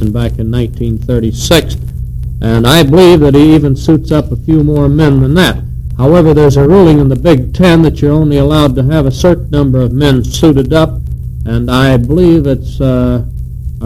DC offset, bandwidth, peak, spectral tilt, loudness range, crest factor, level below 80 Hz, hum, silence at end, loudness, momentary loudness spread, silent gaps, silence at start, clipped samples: under 0.1%; 16 kHz; 0 dBFS; -7 dB/octave; 3 LU; 8 dB; -20 dBFS; none; 0 s; -8 LUFS; 12 LU; none; 0 s; 3%